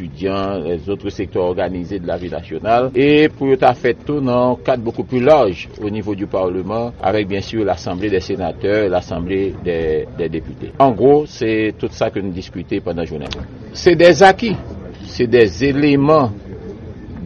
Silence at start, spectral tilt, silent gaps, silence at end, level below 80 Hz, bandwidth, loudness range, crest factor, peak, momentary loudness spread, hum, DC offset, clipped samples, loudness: 0 s; -6.5 dB/octave; none; 0 s; -40 dBFS; 8.4 kHz; 5 LU; 16 dB; 0 dBFS; 14 LU; none; under 0.1%; under 0.1%; -16 LUFS